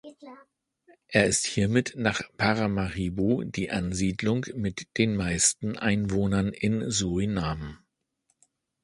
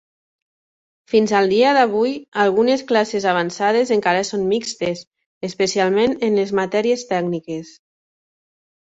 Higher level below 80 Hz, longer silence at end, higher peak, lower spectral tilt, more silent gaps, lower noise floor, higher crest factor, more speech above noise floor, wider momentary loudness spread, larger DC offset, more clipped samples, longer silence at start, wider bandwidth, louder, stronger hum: first, -48 dBFS vs -62 dBFS; about the same, 1.1 s vs 1.1 s; about the same, -4 dBFS vs -2 dBFS; about the same, -4.5 dB/octave vs -4.5 dB/octave; second, none vs 2.28-2.32 s, 5.07-5.11 s, 5.26-5.41 s; second, -75 dBFS vs under -90 dBFS; about the same, 22 dB vs 18 dB; second, 48 dB vs over 72 dB; second, 7 LU vs 10 LU; neither; neither; second, 0.05 s vs 1.1 s; first, 11.5 kHz vs 8 kHz; second, -27 LUFS vs -18 LUFS; neither